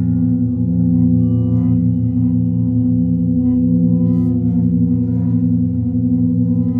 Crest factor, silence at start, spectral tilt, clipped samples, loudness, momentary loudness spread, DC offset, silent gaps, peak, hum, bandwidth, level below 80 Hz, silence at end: 12 dB; 0 s; -14.5 dB/octave; under 0.1%; -15 LUFS; 2 LU; under 0.1%; none; -4 dBFS; none; 1.3 kHz; -36 dBFS; 0 s